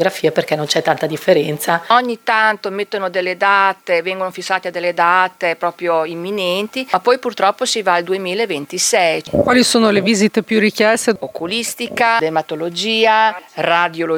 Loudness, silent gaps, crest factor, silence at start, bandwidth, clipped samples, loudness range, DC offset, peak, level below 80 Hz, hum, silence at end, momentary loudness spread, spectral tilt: -16 LUFS; none; 16 dB; 0 s; over 20 kHz; under 0.1%; 3 LU; under 0.1%; 0 dBFS; -56 dBFS; none; 0 s; 7 LU; -3 dB/octave